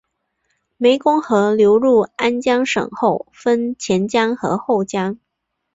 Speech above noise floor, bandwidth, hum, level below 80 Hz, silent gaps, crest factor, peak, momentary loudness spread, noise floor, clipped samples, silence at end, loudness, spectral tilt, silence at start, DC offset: 59 dB; 8 kHz; none; -58 dBFS; none; 14 dB; -2 dBFS; 8 LU; -76 dBFS; under 0.1%; 0.6 s; -17 LUFS; -5 dB/octave; 0.8 s; under 0.1%